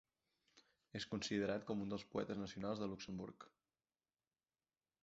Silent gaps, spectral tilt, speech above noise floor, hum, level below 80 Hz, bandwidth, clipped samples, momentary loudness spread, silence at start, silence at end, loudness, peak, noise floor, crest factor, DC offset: none; -4.5 dB/octave; over 45 dB; none; -74 dBFS; 7.6 kHz; under 0.1%; 13 LU; 0.55 s; 1.55 s; -45 LUFS; -28 dBFS; under -90 dBFS; 20 dB; under 0.1%